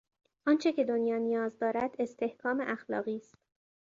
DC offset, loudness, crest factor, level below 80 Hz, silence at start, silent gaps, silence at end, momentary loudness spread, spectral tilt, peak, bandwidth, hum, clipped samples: under 0.1%; -32 LUFS; 16 dB; -76 dBFS; 0.45 s; none; 0.65 s; 7 LU; -6 dB/octave; -16 dBFS; 7.6 kHz; none; under 0.1%